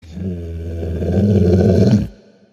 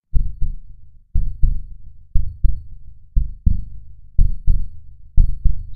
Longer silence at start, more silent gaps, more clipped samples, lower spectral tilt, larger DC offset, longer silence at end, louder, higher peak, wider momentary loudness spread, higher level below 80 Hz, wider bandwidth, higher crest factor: about the same, 0.05 s vs 0.15 s; neither; neither; second, -9 dB/octave vs -11 dB/octave; neither; first, 0.4 s vs 0 s; first, -16 LUFS vs -25 LUFS; about the same, -2 dBFS vs 0 dBFS; second, 14 LU vs 19 LU; second, -32 dBFS vs -18 dBFS; first, 7.4 kHz vs 0.5 kHz; about the same, 14 dB vs 16 dB